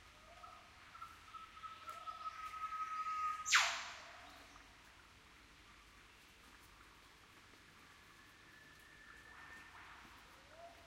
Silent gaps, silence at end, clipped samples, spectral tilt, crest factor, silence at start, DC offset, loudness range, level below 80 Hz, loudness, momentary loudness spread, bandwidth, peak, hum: none; 0 s; under 0.1%; 0.5 dB/octave; 30 dB; 0 s; under 0.1%; 21 LU; -72 dBFS; -41 LUFS; 21 LU; 16 kHz; -18 dBFS; none